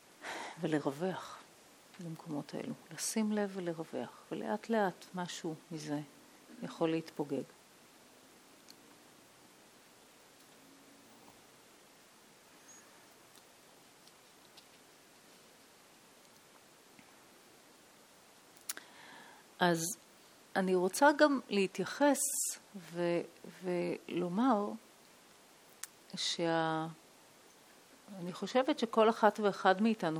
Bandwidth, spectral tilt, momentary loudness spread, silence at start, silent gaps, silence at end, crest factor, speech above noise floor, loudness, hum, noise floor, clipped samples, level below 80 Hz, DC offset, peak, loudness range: 19 kHz; -4 dB/octave; 24 LU; 0.2 s; none; 0 s; 26 dB; 27 dB; -35 LUFS; none; -61 dBFS; under 0.1%; -88 dBFS; under 0.1%; -12 dBFS; 16 LU